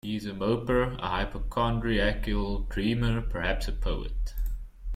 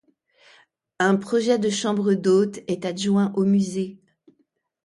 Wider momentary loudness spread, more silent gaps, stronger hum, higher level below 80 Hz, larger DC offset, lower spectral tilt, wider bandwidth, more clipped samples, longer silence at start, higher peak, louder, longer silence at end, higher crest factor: about the same, 9 LU vs 8 LU; neither; neither; first, -32 dBFS vs -68 dBFS; neither; about the same, -6.5 dB/octave vs -5.5 dB/octave; first, 15 kHz vs 11.5 kHz; neither; second, 0.05 s vs 1 s; second, -12 dBFS vs -8 dBFS; second, -30 LUFS vs -22 LUFS; second, 0 s vs 0.9 s; about the same, 16 dB vs 16 dB